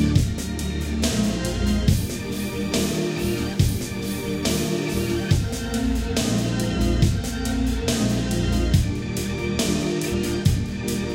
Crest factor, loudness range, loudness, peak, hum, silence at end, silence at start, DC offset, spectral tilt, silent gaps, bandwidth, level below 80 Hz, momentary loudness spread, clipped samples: 18 dB; 1 LU; -23 LUFS; -6 dBFS; none; 0 s; 0 s; under 0.1%; -5.5 dB/octave; none; 17 kHz; -30 dBFS; 6 LU; under 0.1%